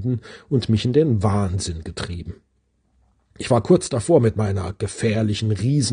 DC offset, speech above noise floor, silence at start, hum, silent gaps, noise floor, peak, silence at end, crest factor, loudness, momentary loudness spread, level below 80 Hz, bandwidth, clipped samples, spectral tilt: under 0.1%; 45 dB; 0 s; none; none; -65 dBFS; -2 dBFS; 0 s; 18 dB; -21 LUFS; 13 LU; -48 dBFS; 10 kHz; under 0.1%; -6.5 dB/octave